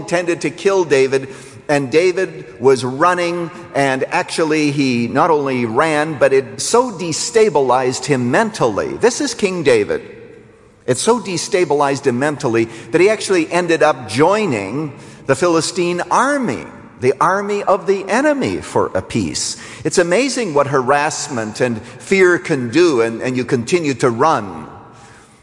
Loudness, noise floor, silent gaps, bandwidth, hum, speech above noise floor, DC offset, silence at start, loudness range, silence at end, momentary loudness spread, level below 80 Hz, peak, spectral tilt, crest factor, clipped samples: -16 LUFS; -44 dBFS; none; 11.5 kHz; none; 29 dB; under 0.1%; 0 s; 2 LU; 0.35 s; 7 LU; -54 dBFS; -2 dBFS; -4.5 dB/octave; 14 dB; under 0.1%